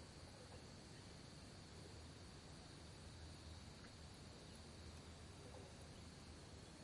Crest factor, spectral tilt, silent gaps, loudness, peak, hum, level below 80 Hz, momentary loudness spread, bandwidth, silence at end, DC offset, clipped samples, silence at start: 14 dB; -4.5 dB/octave; none; -59 LUFS; -44 dBFS; none; -68 dBFS; 1 LU; 11.5 kHz; 0 s; under 0.1%; under 0.1%; 0 s